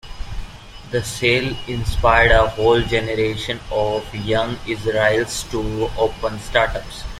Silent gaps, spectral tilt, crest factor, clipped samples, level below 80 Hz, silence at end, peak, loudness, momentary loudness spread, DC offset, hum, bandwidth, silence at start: none; -4.5 dB/octave; 18 dB; under 0.1%; -30 dBFS; 0 s; -2 dBFS; -19 LUFS; 13 LU; under 0.1%; none; 15.5 kHz; 0.05 s